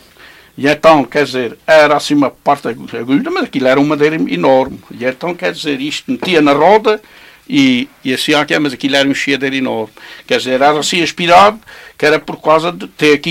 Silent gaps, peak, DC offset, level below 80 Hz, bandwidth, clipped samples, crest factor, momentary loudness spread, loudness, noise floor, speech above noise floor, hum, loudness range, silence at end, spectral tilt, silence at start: none; 0 dBFS; under 0.1%; -52 dBFS; 16 kHz; 0.2%; 12 dB; 10 LU; -12 LUFS; -41 dBFS; 28 dB; none; 2 LU; 0 s; -4.5 dB/octave; 0.55 s